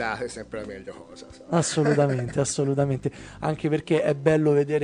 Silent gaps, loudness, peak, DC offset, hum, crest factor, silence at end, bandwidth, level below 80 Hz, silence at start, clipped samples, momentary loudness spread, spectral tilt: none; -24 LUFS; -8 dBFS; under 0.1%; none; 18 dB; 0 s; 10.5 kHz; -54 dBFS; 0 s; under 0.1%; 17 LU; -6 dB/octave